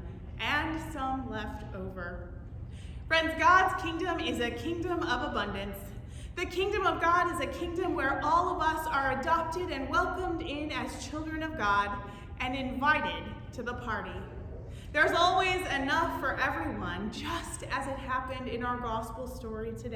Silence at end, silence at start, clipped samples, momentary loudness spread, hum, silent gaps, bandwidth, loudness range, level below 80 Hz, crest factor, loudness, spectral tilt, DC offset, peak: 0 s; 0 s; under 0.1%; 14 LU; none; none; 18 kHz; 4 LU; -46 dBFS; 20 dB; -31 LUFS; -4.5 dB/octave; under 0.1%; -10 dBFS